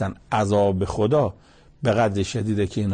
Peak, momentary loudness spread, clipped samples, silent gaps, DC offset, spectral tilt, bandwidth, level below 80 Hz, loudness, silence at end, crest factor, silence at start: -8 dBFS; 5 LU; under 0.1%; none; under 0.1%; -6.5 dB/octave; 9.6 kHz; -46 dBFS; -22 LUFS; 0 s; 14 dB; 0 s